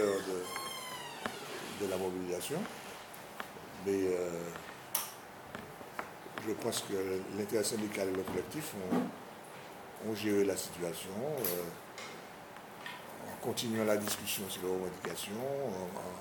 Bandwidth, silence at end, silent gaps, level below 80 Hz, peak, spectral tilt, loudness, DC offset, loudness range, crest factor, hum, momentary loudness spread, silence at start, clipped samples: 20 kHz; 0 s; none; -72 dBFS; -12 dBFS; -4 dB/octave; -38 LUFS; under 0.1%; 3 LU; 26 dB; none; 13 LU; 0 s; under 0.1%